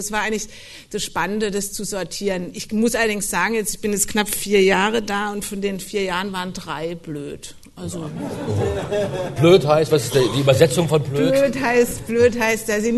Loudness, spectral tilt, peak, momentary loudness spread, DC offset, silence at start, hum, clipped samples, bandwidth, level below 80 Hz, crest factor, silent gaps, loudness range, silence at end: -20 LUFS; -4.5 dB/octave; 0 dBFS; 14 LU; under 0.1%; 0 s; none; under 0.1%; 12.5 kHz; -44 dBFS; 20 dB; none; 9 LU; 0 s